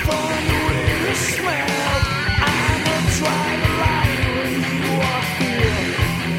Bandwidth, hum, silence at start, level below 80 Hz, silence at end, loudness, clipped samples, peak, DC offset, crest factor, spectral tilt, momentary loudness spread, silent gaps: 16.5 kHz; none; 0 s; -30 dBFS; 0 s; -19 LUFS; under 0.1%; -4 dBFS; under 0.1%; 16 dB; -4.5 dB/octave; 2 LU; none